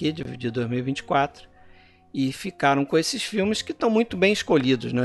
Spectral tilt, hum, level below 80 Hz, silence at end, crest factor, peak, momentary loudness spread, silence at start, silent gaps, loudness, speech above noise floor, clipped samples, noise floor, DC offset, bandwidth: -5 dB/octave; none; -56 dBFS; 0 s; 18 dB; -6 dBFS; 8 LU; 0 s; none; -24 LUFS; 28 dB; under 0.1%; -52 dBFS; under 0.1%; 12 kHz